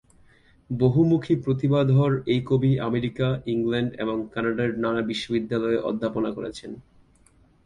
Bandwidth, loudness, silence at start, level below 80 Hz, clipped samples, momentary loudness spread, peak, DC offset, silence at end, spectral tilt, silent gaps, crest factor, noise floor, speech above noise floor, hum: 10 kHz; -24 LUFS; 0.7 s; -54 dBFS; under 0.1%; 9 LU; -8 dBFS; under 0.1%; 0.85 s; -8 dB/octave; none; 18 dB; -58 dBFS; 35 dB; none